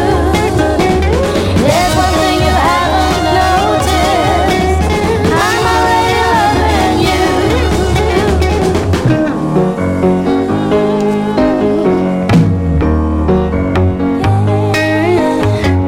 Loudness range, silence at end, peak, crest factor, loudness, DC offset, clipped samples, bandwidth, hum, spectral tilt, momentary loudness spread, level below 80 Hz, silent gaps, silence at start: 1 LU; 0 s; 0 dBFS; 10 dB; -12 LUFS; under 0.1%; under 0.1%; 16.5 kHz; none; -6 dB/octave; 3 LU; -22 dBFS; none; 0 s